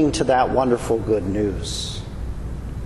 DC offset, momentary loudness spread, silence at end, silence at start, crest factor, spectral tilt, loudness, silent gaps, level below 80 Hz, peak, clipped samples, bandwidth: under 0.1%; 14 LU; 0 s; 0 s; 16 dB; -5.5 dB/octave; -22 LUFS; none; -32 dBFS; -4 dBFS; under 0.1%; 12.5 kHz